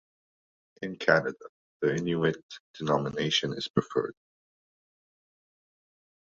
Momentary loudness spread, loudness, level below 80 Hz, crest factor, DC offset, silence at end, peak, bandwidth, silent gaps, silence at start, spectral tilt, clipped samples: 15 LU; -29 LUFS; -66 dBFS; 26 dB; under 0.1%; 2.1 s; -6 dBFS; 7.8 kHz; 1.49-1.80 s, 2.43-2.49 s, 2.60-2.74 s, 3.70-3.74 s; 0.8 s; -5 dB/octave; under 0.1%